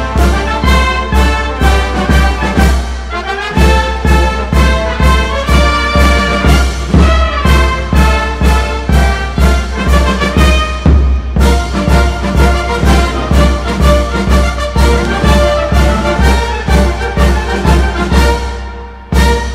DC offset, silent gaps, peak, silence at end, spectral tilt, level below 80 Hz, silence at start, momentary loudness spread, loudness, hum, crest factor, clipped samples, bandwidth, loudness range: under 0.1%; none; 0 dBFS; 0 s; -5.5 dB/octave; -12 dBFS; 0 s; 3 LU; -11 LUFS; none; 10 dB; 0.3%; 14 kHz; 2 LU